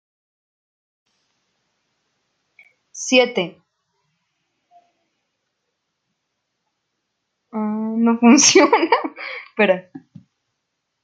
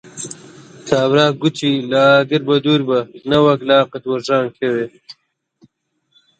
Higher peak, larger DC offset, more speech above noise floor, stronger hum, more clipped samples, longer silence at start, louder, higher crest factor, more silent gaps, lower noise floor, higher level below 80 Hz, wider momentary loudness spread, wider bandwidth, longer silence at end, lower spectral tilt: about the same, 0 dBFS vs 0 dBFS; neither; first, 60 dB vs 50 dB; neither; neither; first, 2.95 s vs 0.15 s; about the same, -16 LUFS vs -15 LUFS; first, 22 dB vs 16 dB; neither; first, -76 dBFS vs -65 dBFS; second, -70 dBFS vs -58 dBFS; about the same, 19 LU vs 17 LU; about the same, 9.4 kHz vs 9.2 kHz; second, 1.05 s vs 1.3 s; second, -2.5 dB/octave vs -5.5 dB/octave